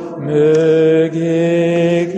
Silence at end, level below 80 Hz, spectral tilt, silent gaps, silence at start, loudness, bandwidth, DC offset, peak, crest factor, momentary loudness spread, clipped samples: 0 s; -60 dBFS; -7.5 dB/octave; none; 0 s; -13 LUFS; 8.4 kHz; under 0.1%; -2 dBFS; 10 dB; 4 LU; under 0.1%